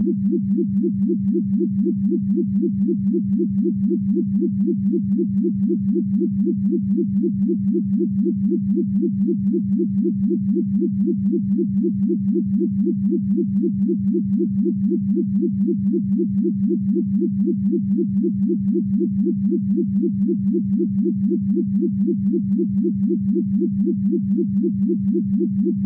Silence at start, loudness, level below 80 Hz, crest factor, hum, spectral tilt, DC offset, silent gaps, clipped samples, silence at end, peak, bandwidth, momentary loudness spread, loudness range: 0 s; -20 LUFS; -52 dBFS; 10 dB; none; -14.5 dB/octave; under 0.1%; none; under 0.1%; 0 s; -10 dBFS; 0.7 kHz; 1 LU; 0 LU